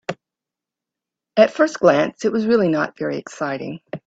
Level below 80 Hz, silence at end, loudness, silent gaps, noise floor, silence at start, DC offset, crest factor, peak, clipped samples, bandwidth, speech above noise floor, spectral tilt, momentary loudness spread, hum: -64 dBFS; 0.1 s; -19 LUFS; none; -87 dBFS; 0.1 s; under 0.1%; 20 dB; 0 dBFS; under 0.1%; 8 kHz; 69 dB; -6 dB/octave; 14 LU; none